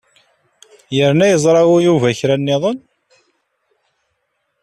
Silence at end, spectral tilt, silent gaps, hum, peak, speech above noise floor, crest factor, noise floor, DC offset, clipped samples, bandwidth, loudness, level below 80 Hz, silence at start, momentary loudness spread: 1.85 s; -5.5 dB/octave; none; none; -2 dBFS; 56 dB; 14 dB; -69 dBFS; under 0.1%; under 0.1%; 13 kHz; -14 LUFS; -58 dBFS; 0.9 s; 10 LU